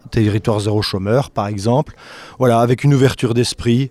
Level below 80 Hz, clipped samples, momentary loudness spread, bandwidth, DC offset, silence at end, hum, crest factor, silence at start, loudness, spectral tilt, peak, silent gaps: -42 dBFS; under 0.1%; 7 LU; 14 kHz; under 0.1%; 0 s; none; 16 dB; 0.05 s; -16 LUFS; -6.5 dB/octave; 0 dBFS; none